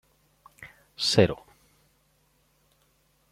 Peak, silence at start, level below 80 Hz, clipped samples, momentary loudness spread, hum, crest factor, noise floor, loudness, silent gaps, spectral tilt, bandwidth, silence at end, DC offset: -6 dBFS; 0.6 s; -60 dBFS; under 0.1%; 27 LU; none; 26 dB; -67 dBFS; -24 LUFS; none; -4.5 dB/octave; 15.5 kHz; 1.95 s; under 0.1%